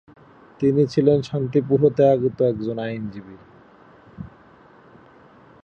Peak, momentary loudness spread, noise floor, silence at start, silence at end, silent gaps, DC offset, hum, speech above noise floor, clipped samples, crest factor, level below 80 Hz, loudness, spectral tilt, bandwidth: -4 dBFS; 23 LU; -50 dBFS; 0.6 s; 1.4 s; none; under 0.1%; none; 30 dB; under 0.1%; 18 dB; -56 dBFS; -20 LUFS; -9 dB/octave; 7.6 kHz